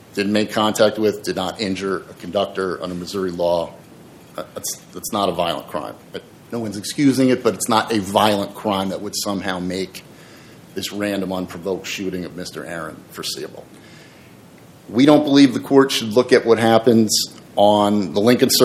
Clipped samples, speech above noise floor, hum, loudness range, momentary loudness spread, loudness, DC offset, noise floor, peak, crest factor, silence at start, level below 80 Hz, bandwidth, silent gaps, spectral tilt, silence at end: under 0.1%; 26 dB; none; 11 LU; 16 LU; -19 LUFS; under 0.1%; -44 dBFS; 0 dBFS; 20 dB; 0.15 s; -60 dBFS; 16.5 kHz; none; -4.5 dB/octave; 0 s